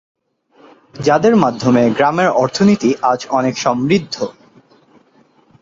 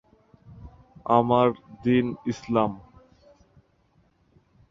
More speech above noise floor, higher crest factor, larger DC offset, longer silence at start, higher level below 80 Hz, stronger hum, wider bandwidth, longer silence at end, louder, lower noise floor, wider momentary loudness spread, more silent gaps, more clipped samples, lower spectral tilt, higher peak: about the same, 39 dB vs 42 dB; second, 16 dB vs 24 dB; neither; first, 0.95 s vs 0.55 s; about the same, -54 dBFS vs -56 dBFS; neither; about the same, 7.8 kHz vs 7.4 kHz; second, 1.3 s vs 1.9 s; first, -14 LUFS vs -24 LUFS; second, -52 dBFS vs -64 dBFS; second, 7 LU vs 12 LU; neither; neither; second, -6 dB/octave vs -7.5 dB/octave; first, 0 dBFS vs -4 dBFS